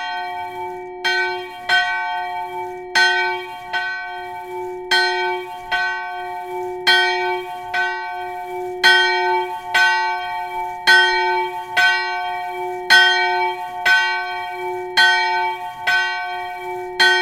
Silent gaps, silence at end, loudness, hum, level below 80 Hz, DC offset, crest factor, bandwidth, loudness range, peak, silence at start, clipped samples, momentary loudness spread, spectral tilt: none; 0 s; -18 LUFS; none; -56 dBFS; under 0.1%; 20 dB; 17 kHz; 5 LU; 0 dBFS; 0 s; under 0.1%; 14 LU; -1 dB/octave